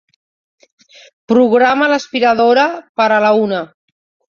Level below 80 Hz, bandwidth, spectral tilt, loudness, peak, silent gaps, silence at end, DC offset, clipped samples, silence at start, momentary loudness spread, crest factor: -60 dBFS; 7.4 kHz; -5 dB/octave; -13 LUFS; 0 dBFS; 2.89-2.95 s; 0.65 s; under 0.1%; under 0.1%; 1.3 s; 7 LU; 14 dB